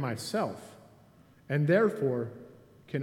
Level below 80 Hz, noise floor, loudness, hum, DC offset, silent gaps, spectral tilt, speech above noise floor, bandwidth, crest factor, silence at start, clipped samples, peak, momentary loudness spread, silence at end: -72 dBFS; -59 dBFS; -30 LUFS; none; under 0.1%; none; -6.5 dB/octave; 30 dB; 14.5 kHz; 20 dB; 0 s; under 0.1%; -12 dBFS; 21 LU; 0 s